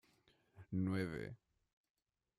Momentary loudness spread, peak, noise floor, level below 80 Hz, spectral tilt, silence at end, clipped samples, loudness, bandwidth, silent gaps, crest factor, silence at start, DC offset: 14 LU; -28 dBFS; -75 dBFS; -72 dBFS; -8 dB/octave; 1.05 s; under 0.1%; -43 LUFS; 12 kHz; none; 18 dB; 0.55 s; under 0.1%